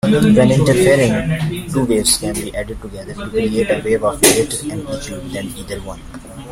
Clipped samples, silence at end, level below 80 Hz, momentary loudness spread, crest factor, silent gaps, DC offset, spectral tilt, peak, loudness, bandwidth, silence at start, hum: under 0.1%; 0 s; -36 dBFS; 17 LU; 16 dB; none; under 0.1%; -4.5 dB/octave; 0 dBFS; -15 LUFS; 16.5 kHz; 0.05 s; none